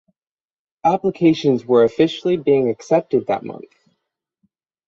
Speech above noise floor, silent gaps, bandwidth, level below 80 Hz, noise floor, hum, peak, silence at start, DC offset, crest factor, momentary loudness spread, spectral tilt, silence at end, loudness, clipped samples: 60 dB; none; 7.6 kHz; -60 dBFS; -77 dBFS; none; -2 dBFS; 0.85 s; under 0.1%; 16 dB; 9 LU; -7 dB/octave; 1.3 s; -18 LUFS; under 0.1%